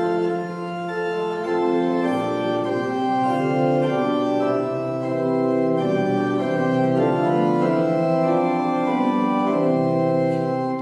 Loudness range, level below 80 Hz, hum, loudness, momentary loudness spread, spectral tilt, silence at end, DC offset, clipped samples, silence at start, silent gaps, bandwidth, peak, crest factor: 2 LU; -66 dBFS; none; -21 LUFS; 5 LU; -8 dB/octave; 0 s; under 0.1%; under 0.1%; 0 s; none; 11.5 kHz; -8 dBFS; 14 dB